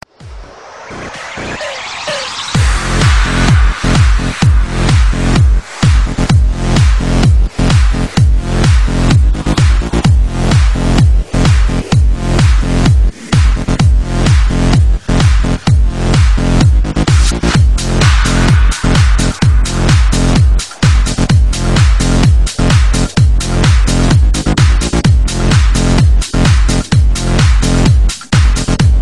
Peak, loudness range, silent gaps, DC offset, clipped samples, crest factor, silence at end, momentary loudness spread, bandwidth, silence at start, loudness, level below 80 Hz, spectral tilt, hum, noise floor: 0 dBFS; 1 LU; none; 0.6%; under 0.1%; 10 dB; 0 s; 3 LU; 11.5 kHz; 0.2 s; -11 LUFS; -12 dBFS; -5.5 dB/octave; none; -31 dBFS